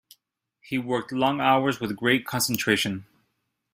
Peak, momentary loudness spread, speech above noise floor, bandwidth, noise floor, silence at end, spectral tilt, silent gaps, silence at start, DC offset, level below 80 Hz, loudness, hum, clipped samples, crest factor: -6 dBFS; 9 LU; 52 dB; 16 kHz; -76 dBFS; 0.7 s; -4 dB/octave; none; 0.65 s; under 0.1%; -62 dBFS; -24 LUFS; none; under 0.1%; 20 dB